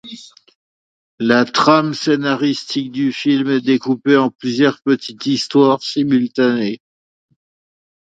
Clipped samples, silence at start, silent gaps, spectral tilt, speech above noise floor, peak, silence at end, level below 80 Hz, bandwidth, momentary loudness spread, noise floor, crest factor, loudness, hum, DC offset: under 0.1%; 0.05 s; 0.55-1.18 s, 4.35-4.39 s; -5.5 dB/octave; 22 dB; 0 dBFS; 1.25 s; -64 dBFS; 7.8 kHz; 8 LU; -37 dBFS; 16 dB; -16 LUFS; none; under 0.1%